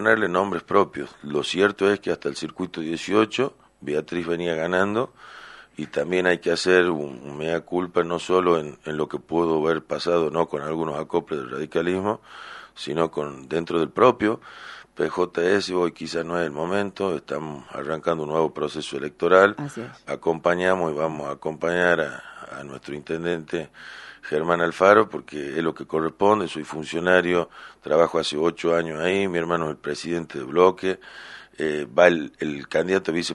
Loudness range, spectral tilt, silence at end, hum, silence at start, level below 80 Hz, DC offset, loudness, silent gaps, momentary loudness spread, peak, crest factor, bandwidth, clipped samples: 4 LU; -5 dB/octave; 0 s; none; 0 s; -60 dBFS; under 0.1%; -23 LUFS; none; 15 LU; 0 dBFS; 24 dB; 11.5 kHz; under 0.1%